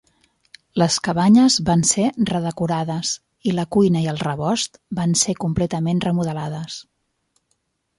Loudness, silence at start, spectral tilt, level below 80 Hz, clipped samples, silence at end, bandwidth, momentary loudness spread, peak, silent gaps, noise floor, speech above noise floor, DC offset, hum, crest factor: -20 LUFS; 0.75 s; -4.5 dB/octave; -50 dBFS; under 0.1%; 1.15 s; 11.5 kHz; 11 LU; -4 dBFS; none; -70 dBFS; 51 dB; under 0.1%; none; 16 dB